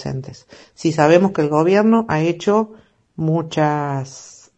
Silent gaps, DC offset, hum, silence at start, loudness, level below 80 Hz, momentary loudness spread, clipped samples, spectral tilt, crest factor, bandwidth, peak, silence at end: none; under 0.1%; none; 0 s; -17 LUFS; -56 dBFS; 15 LU; under 0.1%; -7 dB/octave; 18 dB; 8.4 kHz; 0 dBFS; 0.3 s